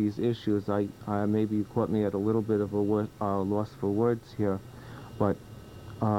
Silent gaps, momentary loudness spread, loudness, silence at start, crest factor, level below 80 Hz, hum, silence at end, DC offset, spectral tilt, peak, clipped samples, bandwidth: none; 12 LU; -29 LUFS; 0 s; 18 dB; -58 dBFS; none; 0 s; under 0.1%; -9 dB/octave; -12 dBFS; under 0.1%; 16 kHz